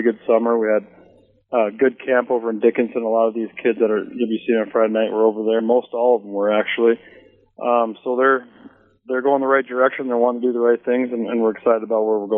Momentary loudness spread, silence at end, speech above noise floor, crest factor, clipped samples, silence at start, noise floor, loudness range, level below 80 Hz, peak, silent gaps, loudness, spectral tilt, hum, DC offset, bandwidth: 5 LU; 0 s; 33 dB; 16 dB; under 0.1%; 0 s; -52 dBFS; 1 LU; -72 dBFS; -2 dBFS; none; -19 LUFS; -3.5 dB/octave; none; under 0.1%; 3.8 kHz